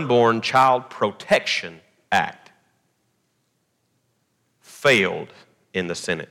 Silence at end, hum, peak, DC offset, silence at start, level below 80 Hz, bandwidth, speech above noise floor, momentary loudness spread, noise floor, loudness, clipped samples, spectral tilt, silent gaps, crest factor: 0.05 s; none; -4 dBFS; under 0.1%; 0 s; -66 dBFS; 17.5 kHz; 50 dB; 13 LU; -70 dBFS; -21 LUFS; under 0.1%; -4 dB/octave; none; 18 dB